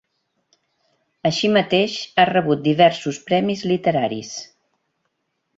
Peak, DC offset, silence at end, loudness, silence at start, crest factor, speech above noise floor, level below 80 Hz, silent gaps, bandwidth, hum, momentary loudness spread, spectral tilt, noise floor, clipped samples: -2 dBFS; under 0.1%; 1.15 s; -19 LUFS; 1.25 s; 20 dB; 55 dB; -62 dBFS; none; 7.8 kHz; none; 10 LU; -5 dB/octave; -73 dBFS; under 0.1%